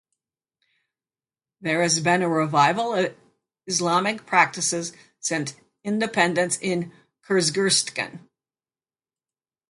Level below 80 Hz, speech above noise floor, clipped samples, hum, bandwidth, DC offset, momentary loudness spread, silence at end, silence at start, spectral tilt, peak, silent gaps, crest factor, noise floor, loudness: -70 dBFS; over 67 dB; under 0.1%; none; 11.5 kHz; under 0.1%; 11 LU; 1.55 s; 1.6 s; -3 dB/octave; -4 dBFS; none; 22 dB; under -90 dBFS; -22 LUFS